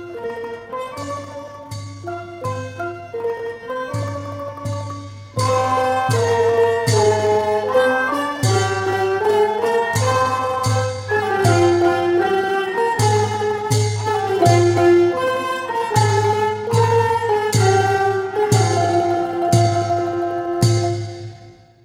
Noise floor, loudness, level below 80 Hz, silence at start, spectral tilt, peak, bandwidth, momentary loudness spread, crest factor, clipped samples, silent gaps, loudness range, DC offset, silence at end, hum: -43 dBFS; -18 LUFS; -52 dBFS; 0 s; -5.5 dB/octave; -2 dBFS; 15.5 kHz; 13 LU; 16 dB; under 0.1%; none; 10 LU; under 0.1%; 0.35 s; none